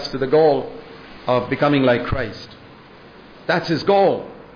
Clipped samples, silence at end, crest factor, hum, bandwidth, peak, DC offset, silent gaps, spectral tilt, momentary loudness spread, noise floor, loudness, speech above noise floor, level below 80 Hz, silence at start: under 0.1%; 0.15 s; 14 dB; none; 5.2 kHz; -6 dBFS; under 0.1%; none; -7 dB/octave; 20 LU; -43 dBFS; -18 LUFS; 26 dB; -42 dBFS; 0 s